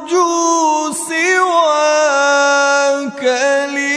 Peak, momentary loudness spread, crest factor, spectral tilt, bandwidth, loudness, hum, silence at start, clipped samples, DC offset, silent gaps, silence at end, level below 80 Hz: -2 dBFS; 5 LU; 12 dB; -1 dB/octave; 11 kHz; -13 LUFS; none; 0 s; under 0.1%; under 0.1%; none; 0 s; -68 dBFS